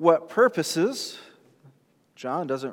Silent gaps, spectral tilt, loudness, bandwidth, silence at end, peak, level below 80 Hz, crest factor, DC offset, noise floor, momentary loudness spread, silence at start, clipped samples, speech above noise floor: none; -4.5 dB/octave; -25 LUFS; 17.5 kHz; 0 s; -4 dBFS; -88 dBFS; 20 dB; under 0.1%; -61 dBFS; 15 LU; 0 s; under 0.1%; 37 dB